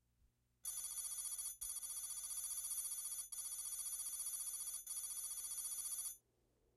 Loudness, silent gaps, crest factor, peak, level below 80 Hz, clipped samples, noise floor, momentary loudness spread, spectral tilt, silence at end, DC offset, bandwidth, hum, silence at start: -44 LUFS; none; 14 dB; -34 dBFS; -78 dBFS; under 0.1%; -80 dBFS; 3 LU; 3 dB/octave; 0.6 s; under 0.1%; 16 kHz; none; 0.65 s